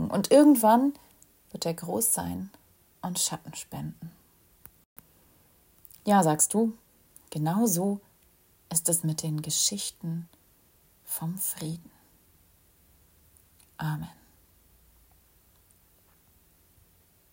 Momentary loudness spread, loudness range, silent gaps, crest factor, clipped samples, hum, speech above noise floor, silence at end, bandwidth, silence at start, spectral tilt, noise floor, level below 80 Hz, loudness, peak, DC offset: 19 LU; 16 LU; 4.85-4.96 s; 22 dB; under 0.1%; none; 37 dB; 3.25 s; 16.5 kHz; 0 s; -4.5 dB/octave; -63 dBFS; -66 dBFS; -26 LUFS; -8 dBFS; under 0.1%